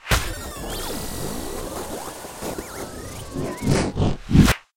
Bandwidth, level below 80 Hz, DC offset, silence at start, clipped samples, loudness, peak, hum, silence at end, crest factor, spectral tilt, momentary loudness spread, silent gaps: 16.5 kHz; -32 dBFS; under 0.1%; 0.05 s; under 0.1%; -25 LUFS; -2 dBFS; none; 0.15 s; 22 dB; -5 dB/octave; 16 LU; none